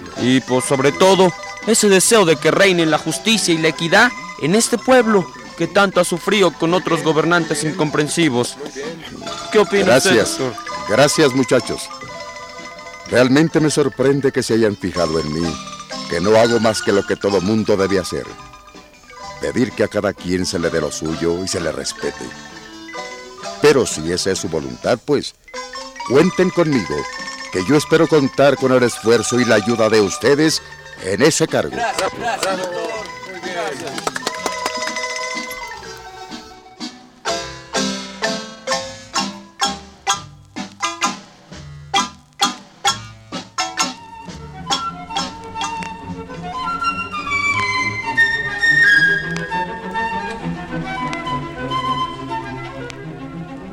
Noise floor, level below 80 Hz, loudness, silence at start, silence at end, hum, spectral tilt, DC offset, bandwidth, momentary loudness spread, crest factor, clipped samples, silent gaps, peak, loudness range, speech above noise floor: -42 dBFS; -48 dBFS; -17 LUFS; 0 s; 0 s; none; -4 dB/octave; under 0.1%; 17 kHz; 18 LU; 16 dB; under 0.1%; none; -2 dBFS; 9 LU; 26 dB